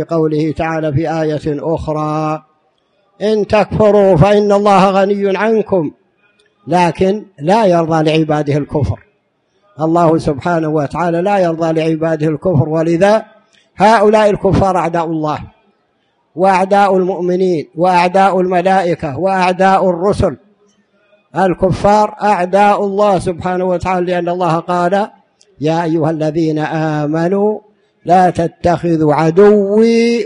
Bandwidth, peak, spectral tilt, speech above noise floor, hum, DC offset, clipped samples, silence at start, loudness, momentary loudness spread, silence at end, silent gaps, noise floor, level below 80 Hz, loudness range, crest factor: 10.5 kHz; 0 dBFS; -7 dB/octave; 48 dB; none; under 0.1%; under 0.1%; 0 s; -13 LUFS; 8 LU; 0 s; none; -60 dBFS; -40 dBFS; 4 LU; 12 dB